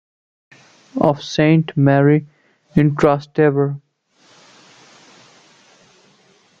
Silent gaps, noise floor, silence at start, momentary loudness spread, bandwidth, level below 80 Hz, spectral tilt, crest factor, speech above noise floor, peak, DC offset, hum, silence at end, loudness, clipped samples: none; -55 dBFS; 0.95 s; 8 LU; 7.4 kHz; -52 dBFS; -8 dB/octave; 18 dB; 40 dB; 0 dBFS; under 0.1%; none; 2.8 s; -16 LUFS; under 0.1%